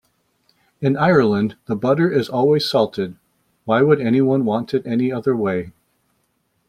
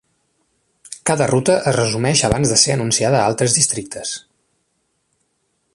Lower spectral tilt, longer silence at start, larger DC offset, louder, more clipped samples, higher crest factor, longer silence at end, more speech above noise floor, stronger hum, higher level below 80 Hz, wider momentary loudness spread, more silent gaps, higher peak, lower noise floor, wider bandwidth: first, -7.5 dB/octave vs -3.5 dB/octave; about the same, 0.8 s vs 0.9 s; neither; about the same, -18 LUFS vs -16 LUFS; neither; about the same, 18 dB vs 20 dB; second, 1 s vs 1.55 s; about the same, 50 dB vs 52 dB; neither; second, -58 dBFS vs -46 dBFS; second, 9 LU vs 12 LU; neither; about the same, -2 dBFS vs 0 dBFS; about the same, -67 dBFS vs -68 dBFS; first, 14.5 kHz vs 11.5 kHz